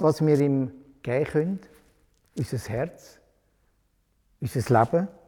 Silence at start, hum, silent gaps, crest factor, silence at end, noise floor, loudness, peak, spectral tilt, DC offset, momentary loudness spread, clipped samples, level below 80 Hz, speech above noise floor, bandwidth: 0 s; none; none; 20 dB; 0.15 s; -68 dBFS; -26 LUFS; -6 dBFS; -7.5 dB/octave; under 0.1%; 15 LU; under 0.1%; -56 dBFS; 44 dB; 18 kHz